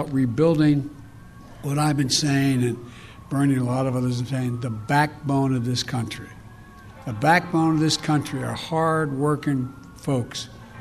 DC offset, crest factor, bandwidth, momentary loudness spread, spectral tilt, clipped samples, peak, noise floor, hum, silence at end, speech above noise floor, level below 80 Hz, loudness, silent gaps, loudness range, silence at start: under 0.1%; 18 dB; 14.5 kHz; 15 LU; -5.5 dB/octave; under 0.1%; -4 dBFS; -44 dBFS; none; 0 s; 22 dB; -52 dBFS; -23 LUFS; none; 2 LU; 0 s